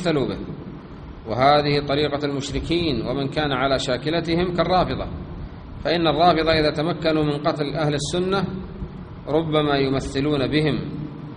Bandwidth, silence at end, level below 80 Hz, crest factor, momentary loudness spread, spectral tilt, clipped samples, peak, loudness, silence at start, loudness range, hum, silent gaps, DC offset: 10 kHz; 0 s; -40 dBFS; 18 dB; 17 LU; -6 dB/octave; under 0.1%; -2 dBFS; -21 LUFS; 0 s; 2 LU; none; none; under 0.1%